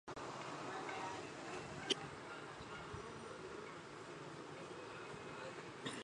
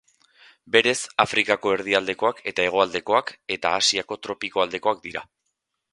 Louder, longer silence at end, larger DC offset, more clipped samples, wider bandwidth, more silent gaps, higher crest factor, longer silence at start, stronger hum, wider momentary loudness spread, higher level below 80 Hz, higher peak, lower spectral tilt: second, -48 LUFS vs -22 LUFS; second, 0 s vs 0.7 s; neither; neither; about the same, 11 kHz vs 11.5 kHz; neither; about the same, 26 dB vs 24 dB; second, 0.05 s vs 0.65 s; neither; about the same, 10 LU vs 10 LU; second, -72 dBFS vs -62 dBFS; second, -22 dBFS vs 0 dBFS; first, -3.5 dB/octave vs -2 dB/octave